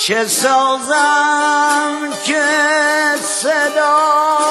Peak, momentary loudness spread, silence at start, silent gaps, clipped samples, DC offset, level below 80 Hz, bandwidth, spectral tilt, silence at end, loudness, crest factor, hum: 0 dBFS; 4 LU; 0 s; none; under 0.1%; under 0.1%; -74 dBFS; 12.5 kHz; -1 dB/octave; 0 s; -13 LUFS; 14 dB; none